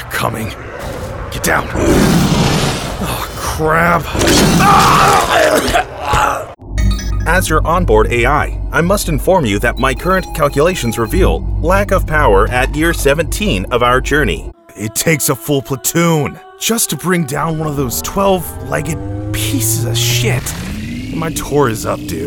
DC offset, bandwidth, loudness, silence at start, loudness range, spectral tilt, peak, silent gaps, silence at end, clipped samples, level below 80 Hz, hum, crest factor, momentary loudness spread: under 0.1%; over 20 kHz; -14 LUFS; 0 s; 5 LU; -4.5 dB/octave; 0 dBFS; none; 0 s; under 0.1%; -22 dBFS; none; 14 dB; 10 LU